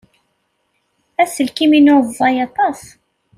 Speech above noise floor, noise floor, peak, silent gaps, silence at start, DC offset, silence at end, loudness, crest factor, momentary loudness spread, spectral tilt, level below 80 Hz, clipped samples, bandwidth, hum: 53 dB; -66 dBFS; -2 dBFS; none; 1.2 s; under 0.1%; 0.6 s; -14 LUFS; 14 dB; 10 LU; -3.5 dB/octave; -60 dBFS; under 0.1%; 14 kHz; none